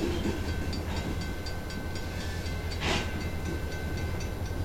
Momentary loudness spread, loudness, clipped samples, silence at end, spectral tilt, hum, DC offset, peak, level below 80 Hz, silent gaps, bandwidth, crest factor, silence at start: 6 LU; -34 LUFS; under 0.1%; 0 s; -5 dB/octave; none; under 0.1%; -14 dBFS; -38 dBFS; none; 16.5 kHz; 18 dB; 0 s